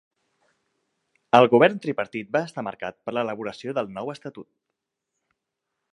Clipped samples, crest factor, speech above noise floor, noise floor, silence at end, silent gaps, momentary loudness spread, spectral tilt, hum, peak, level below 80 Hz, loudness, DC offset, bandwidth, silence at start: under 0.1%; 26 dB; 59 dB; -82 dBFS; 1.5 s; none; 17 LU; -6.5 dB/octave; none; 0 dBFS; -72 dBFS; -23 LUFS; under 0.1%; 11 kHz; 1.35 s